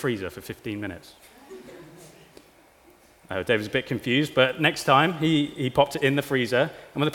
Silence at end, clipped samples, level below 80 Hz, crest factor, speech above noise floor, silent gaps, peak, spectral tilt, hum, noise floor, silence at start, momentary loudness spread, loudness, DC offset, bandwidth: 0 s; under 0.1%; -58 dBFS; 22 dB; 31 dB; none; -2 dBFS; -5.5 dB/octave; none; -55 dBFS; 0 s; 16 LU; -24 LUFS; under 0.1%; 18 kHz